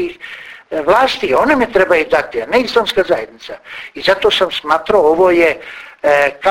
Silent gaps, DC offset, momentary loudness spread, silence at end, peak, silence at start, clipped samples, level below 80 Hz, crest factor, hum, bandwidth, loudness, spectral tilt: none; under 0.1%; 18 LU; 0 s; 0 dBFS; 0 s; under 0.1%; -46 dBFS; 14 dB; none; 16.5 kHz; -13 LUFS; -4 dB/octave